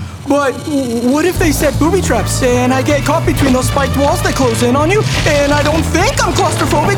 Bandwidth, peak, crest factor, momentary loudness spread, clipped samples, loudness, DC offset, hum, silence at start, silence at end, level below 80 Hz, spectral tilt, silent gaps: over 20 kHz; -2 dBFS; 12 dB; 2 LU; under 0.1%; -13 LUFS; under 0.1%; none; 0 s; 0 s; -26 dBFS; -5 dB/octave; none